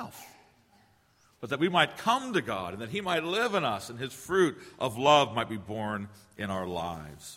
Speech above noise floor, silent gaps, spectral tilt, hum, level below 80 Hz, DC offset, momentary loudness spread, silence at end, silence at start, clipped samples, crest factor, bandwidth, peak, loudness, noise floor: 36 dB; none; -4.5 dB/octave; none; -64 dBFS; under 0.1%; 15 LU; 0 s; 0 s; under 0.1%; 24 dB; 16 kHz; -6 dBFS; -29 LUFS; -65 dBFS